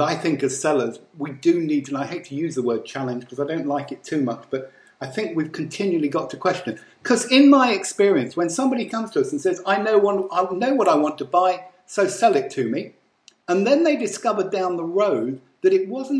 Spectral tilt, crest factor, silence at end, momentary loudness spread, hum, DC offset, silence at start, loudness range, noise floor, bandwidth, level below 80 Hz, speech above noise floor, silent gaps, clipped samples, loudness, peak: -4.5 dB/octave; 18 dB; 0 s; 11 LU; none; under 0.1%; 0 s; 7 LU; -56 dBFS; 11 kHz; -74 dBFS; 36 dB; none; under 0.1%; -21 LUFS; -4 dBFS